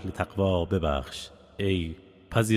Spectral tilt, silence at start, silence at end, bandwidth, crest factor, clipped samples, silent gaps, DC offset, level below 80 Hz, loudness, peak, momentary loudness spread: -6 dB/octave; 0 s; 0 s; 16 kHz; 18 dB; under 0.1%; none; under 0.1%; -40 dBFS; -29 LUFS; -10 dBFS; 13 LU